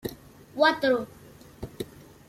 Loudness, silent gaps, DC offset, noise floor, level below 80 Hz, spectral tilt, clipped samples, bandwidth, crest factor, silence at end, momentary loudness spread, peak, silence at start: -24 LUFS; none; under 0.1%; -47 dBFS; -58 dBFS; -4.5 dB/octave; under 0.1%; 16 kHz; 22 dB; 0.45 s; 21 LU; -8 dBFS; 0.05 s